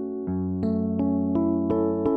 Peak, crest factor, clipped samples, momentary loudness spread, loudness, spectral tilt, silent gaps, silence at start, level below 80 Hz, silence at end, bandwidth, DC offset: -12 dBFS; 12 dB; under 0.1%; 5 LU; -25 LUFS; -12 dB/octave; none; 0 s; -54 dBFS; 0 s; 4.7 kHz; under 0.1%